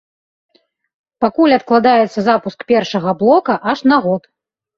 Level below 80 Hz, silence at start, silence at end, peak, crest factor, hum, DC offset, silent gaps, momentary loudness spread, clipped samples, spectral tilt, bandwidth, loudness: -58 dBFS; 1.2 s; 0.6 s; -2 dBFS; 14 dB; none; under 0.1%; none; 7 LU; under 0.1%; -6.5 dB/octave; 7.4 kHz; -14 LUFS